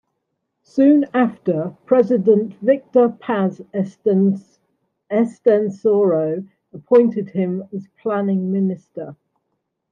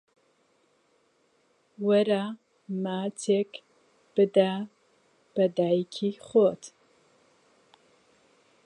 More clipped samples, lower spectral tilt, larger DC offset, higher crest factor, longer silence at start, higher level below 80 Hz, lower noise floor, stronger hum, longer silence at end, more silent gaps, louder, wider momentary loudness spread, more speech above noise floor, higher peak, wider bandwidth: neither; first, -9.5 dB/octave vs -6 dB/octave; neither; about the same, 16 dB vs 20 dB; second, 0.75 s vs 1.8 s; first, -70 dBFS vs -80 dBFS; first, -75 dBFS vs -68 dBFS; neither; second, 0.8 s vs 1.95 s; neither; first, -18 LUFS vs -27 LUFS; second, 13 LU vs 16 LU; first, 57 dB vs 43 dB; first, -2 dBFS vs -10 dBFS; second, 7.2 kHz vs 10.5 kHz